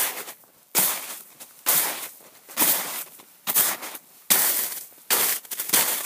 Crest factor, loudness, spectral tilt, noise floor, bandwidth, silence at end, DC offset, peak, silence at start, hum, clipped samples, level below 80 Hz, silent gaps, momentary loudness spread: 24 dB; -22 LUFS; 0.5 dB/octave; -45 dBFS; 16 kHz; 0 s; under 0.1%; -2 dBFS; 0 s; none; under 0.1%; -80 dBFS; none; 18 LU